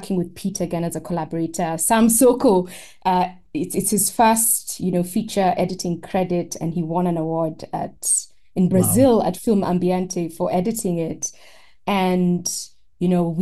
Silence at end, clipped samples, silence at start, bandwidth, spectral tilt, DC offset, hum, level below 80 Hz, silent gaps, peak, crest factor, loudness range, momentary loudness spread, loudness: 0 s; under 0.1%; 0 s; 13 kHz; -5 dB/octave; 0.5%; none; -50 dBFS; none; -4 dBFS; 16 dB; 5 LU; 11 LU; -20 LUFS